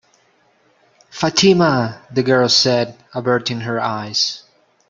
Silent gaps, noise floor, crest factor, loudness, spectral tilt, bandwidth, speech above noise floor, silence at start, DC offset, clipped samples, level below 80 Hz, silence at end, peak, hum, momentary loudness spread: none; -58 dBFS; 16 dB; -16 LUFS; -4 dB/octave; 7.6 kHz; 41 dB; 1.15 s; under 0.1%; under 0.1%; -58 dBFS; 0.5 s; -2 dBFS; none; 11 LU